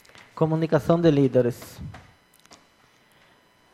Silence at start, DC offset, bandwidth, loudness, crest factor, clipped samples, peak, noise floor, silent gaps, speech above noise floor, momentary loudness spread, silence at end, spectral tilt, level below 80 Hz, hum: 0.35 s; under 0.1%; 15 kHz; -22 LUFS; 18 dB; under 0.1%; -6 dBFS; -59 dBFS; none; 38 dB; 22 LU; 1.75 s; -8 dB/octave; -56 dBFS; none